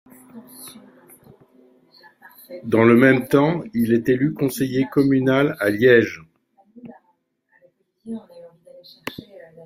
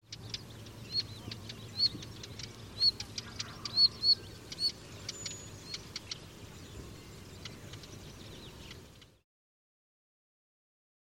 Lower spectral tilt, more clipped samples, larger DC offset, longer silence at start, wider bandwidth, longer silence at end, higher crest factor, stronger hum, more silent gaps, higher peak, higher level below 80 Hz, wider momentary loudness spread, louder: first, -7 dB/octave vs -2 dB/octave; neither; neither; first, 0.35 s vs 0.1 s; about the same, 16 kHz vs 16.5 kHz; second, 0.55 s vs 2.1 s; about the same, 20 dB vs 24 dB; neither; neither; first, -2 dBFS vs -16 dBFS; about the same, -60 dBFS vs -60 dBFS; first, 24 LU vs 21 LU; first, -18 LUFS vs -32 LUFS